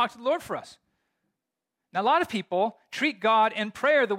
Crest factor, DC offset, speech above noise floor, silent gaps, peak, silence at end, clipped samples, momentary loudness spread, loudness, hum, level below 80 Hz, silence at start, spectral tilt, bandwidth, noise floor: 16 dB; under 0.1%; 60 dB; none; -12 dBFS; 0 s; under 0.1%; 9 LU; -26 LUFS; none; -72 dBFS; 0 s; -4.5 dB/octave; 16 kHz; -86 dBFS